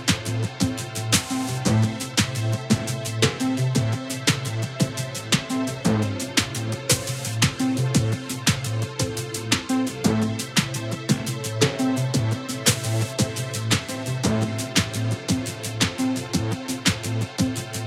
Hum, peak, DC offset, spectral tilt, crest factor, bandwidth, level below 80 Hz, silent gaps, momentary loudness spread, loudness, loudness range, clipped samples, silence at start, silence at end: none; -2 dBFS; under 0.1%; -4 dB/octave; 22 dB; 16.5 kHz; -50 dBFS; none; 5 LU; -24 LUFS; 1 LU; under 0.1%; 0 s; 0 s